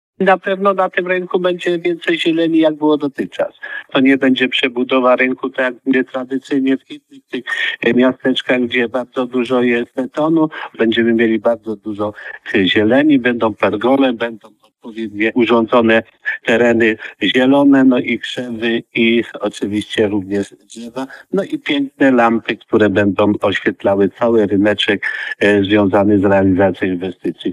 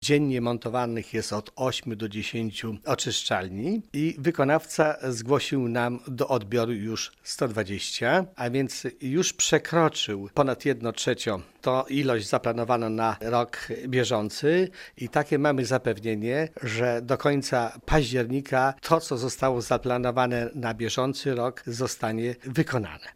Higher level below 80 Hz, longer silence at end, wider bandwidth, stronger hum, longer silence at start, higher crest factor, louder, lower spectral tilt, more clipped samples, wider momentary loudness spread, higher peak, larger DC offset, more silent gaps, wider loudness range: second, -60 dBFS vs -48 dBFS; about the same, 0 s vs 0.05 s; second, 11 kHz vs 16 kHz; neither; first, 0.2 s vs 0 s; second, 14 dB vs 22 dB; first, -15 LUFS vs -27 LUFS; first, -6 dB/octave vs -4.5 dB/octave; neither; first, 10 LU vs 7 LU; first, 0 dBFS vs -4 dBFS; neither; neither; about the same, 3 LU vs 2 LU